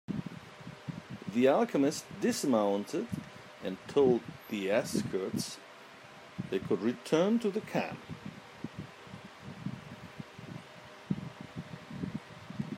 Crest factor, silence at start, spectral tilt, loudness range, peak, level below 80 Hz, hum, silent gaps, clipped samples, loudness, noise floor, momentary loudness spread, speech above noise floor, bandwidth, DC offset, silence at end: 20 dB; 0.1 s; -5.5 dB/octave; 13 LU; -14 dBFS; -70 dBFS; none; none; under 0.1%; -33 LUFS; -52 dBFS; 20 LU; 22 dB; 16 kHz; under 0.1%; 0 s